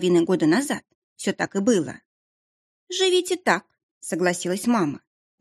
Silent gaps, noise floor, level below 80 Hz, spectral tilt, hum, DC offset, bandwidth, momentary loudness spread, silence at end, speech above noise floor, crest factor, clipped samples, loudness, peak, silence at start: 0.95-1.16 s, 2.05-2.87 s, 3.83-4.01 s; under -90 dBFS; -70 dBFS; -4.5 dB/octave; none; under 0.1%; 13.5 kHz; 11 LU; 0.45 s; over 68 dB; 20 dB; under 0.1%; -23 LUFS; -4 dBFS; 0 s